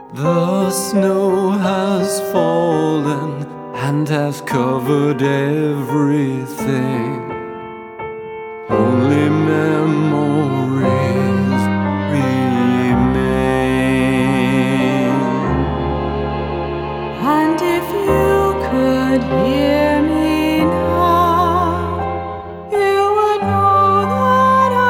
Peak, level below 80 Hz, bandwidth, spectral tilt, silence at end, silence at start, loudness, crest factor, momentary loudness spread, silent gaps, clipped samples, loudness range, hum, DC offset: -2 dBFS; -36 dBFS; 19 kHz; -6.5 dB/octave; 0 s; 0 s; -16 LUFS; 14 dB; 9 LU; none; under 0.1%; 3 LU; none; under 0.1%